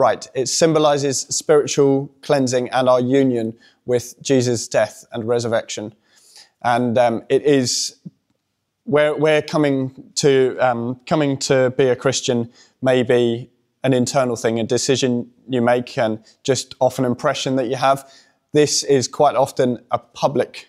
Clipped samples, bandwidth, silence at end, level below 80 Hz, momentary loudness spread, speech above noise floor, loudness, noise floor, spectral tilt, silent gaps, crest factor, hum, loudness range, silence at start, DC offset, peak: under 0.1%; 14.5 kHz; 0.05 s; -64 dBFS; 8 LU; 55 dB; -18 LUFS; -73 dBFS; -4.5 dB/octave; none; 16 dB; none; 3 LU; 0 s; under 0.1%; -2 dBFS